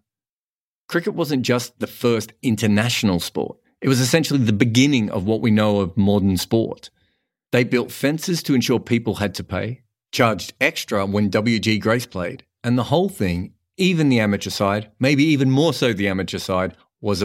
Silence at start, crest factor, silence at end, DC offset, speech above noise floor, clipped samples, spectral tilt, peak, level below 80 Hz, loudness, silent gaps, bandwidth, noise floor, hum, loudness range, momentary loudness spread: 0.9 s; 20 dB; 0 s; under 0.1%; over 71 dB; under 0.1%; -5.5 dB/octave; 0 dBFS; -52 dBFS; -20 LUFS; none; 16.5 kHz; under -90 dBFS; none; 3 LU; 10 LU